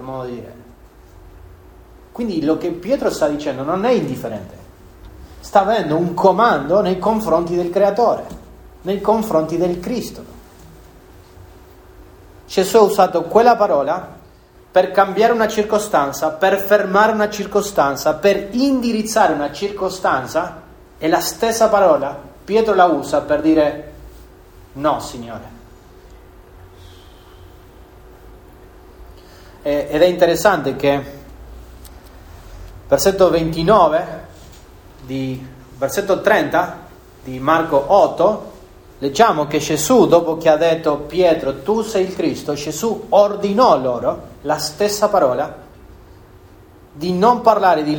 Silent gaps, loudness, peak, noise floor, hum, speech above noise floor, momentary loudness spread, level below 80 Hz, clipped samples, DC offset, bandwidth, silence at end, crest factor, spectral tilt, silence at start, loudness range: none; -16 LUFS; 0 dBFS; -46 dBFS; none; 30 dB; 14 LU; -44 dBFS; under 0.1%; under 0.1%; over 20 kHz; 0 s; 18 dB; -5 dB/octave; 0 s; 7 LU